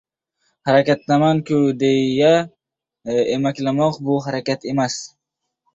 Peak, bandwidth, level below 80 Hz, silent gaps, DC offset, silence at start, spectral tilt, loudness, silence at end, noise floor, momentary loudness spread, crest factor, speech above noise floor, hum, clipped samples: -2 dBFS; 8 kHz; -60 dBFS; none; under 0.1%; 0.65 s; -6 dB/octave; -18 LUFS; 0.65 s; -79 dBFS; 10 LU; 18 dB; 62 dB; none; under 0.1%